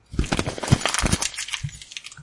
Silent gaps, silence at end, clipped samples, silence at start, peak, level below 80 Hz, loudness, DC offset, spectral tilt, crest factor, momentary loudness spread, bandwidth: none; 0 s; under 0.1%; 0.1 s; -2 dBFS; -34 dBFS; -24 LUFS; under 0.1%; -3.5 dB/octave; 24 dB; 13 LU; 11.5 kHz